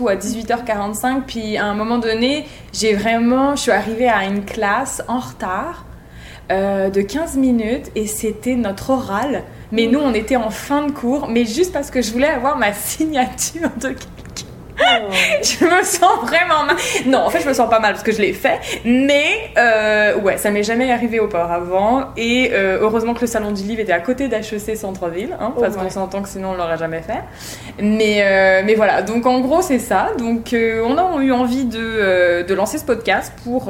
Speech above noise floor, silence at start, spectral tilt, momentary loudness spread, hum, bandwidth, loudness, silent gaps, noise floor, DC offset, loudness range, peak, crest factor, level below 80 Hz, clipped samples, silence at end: 20 dB; 0 s; -4 dB/octave; 10 LU; none; 17 kHz; -17 LUFS; none; -37 dBFS; under 0.1%; 5 LU; -2 dBFS; 16 dB; -42 dBFS; under 0.1%; 0 s